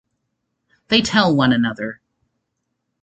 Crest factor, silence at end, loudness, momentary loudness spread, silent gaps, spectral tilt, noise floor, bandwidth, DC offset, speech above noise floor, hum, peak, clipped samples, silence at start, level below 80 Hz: 20 dB; 1.1 s; -17 LUFS; 13 LU; none; -5 dB/octave; -75 dBFS; 8.8 kHz; under 0.1%; 59 dB; none; -2 dBFS; under 0.1%; 0.9 s; -52 dBFS